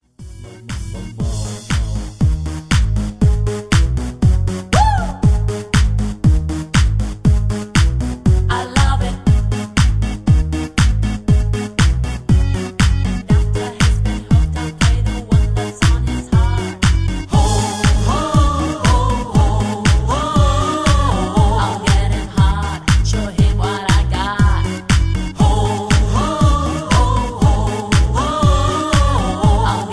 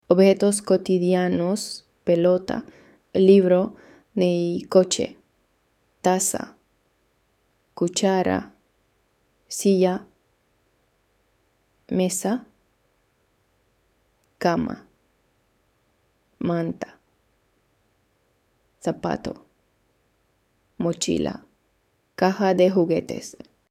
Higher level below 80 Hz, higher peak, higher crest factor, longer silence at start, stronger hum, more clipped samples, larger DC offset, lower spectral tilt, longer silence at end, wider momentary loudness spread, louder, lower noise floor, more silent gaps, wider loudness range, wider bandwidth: first, -18 dBFS vs -60 dBFS; about the same, -2 dBFS vs -4 dBFS; second, 14 dB vs 22 dB; about the same, 0.2 s vs 0.1 s; neither; neither; neither; about the same, -5.5 dB/octave vs -5.5 dB/octave; second, 0 s vs 0.4 s; second, 5 LU vs 15 LU; first, -16 LUFS vs -22 LUFS; second, -34 dBFS vs -68 dBFS; neither; second, 1 LU vs 13 LU; second, 11 kHz vs 15.5 kHz